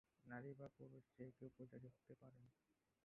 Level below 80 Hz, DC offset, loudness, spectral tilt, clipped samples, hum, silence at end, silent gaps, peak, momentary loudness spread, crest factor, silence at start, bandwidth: -88 dBFS; under 0.1%; -61 LUFS; -5 dB/octave; under 0.1%; none; 0.3 s; none; -42 dBFS; 10 LU; 18 dB; 0.25 s; 3.6 kHz